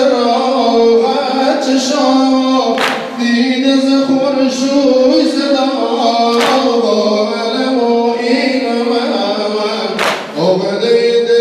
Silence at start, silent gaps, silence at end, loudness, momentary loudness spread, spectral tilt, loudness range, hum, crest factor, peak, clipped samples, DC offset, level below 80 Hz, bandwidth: 0 s; none; 0 s; -12 LUFS; 5 LU; -4 dB/octave; 2 LU; none; 10 dB; 0 dBFS; under 0.1%; under 0.1%; -60 dBFS; 13 kHz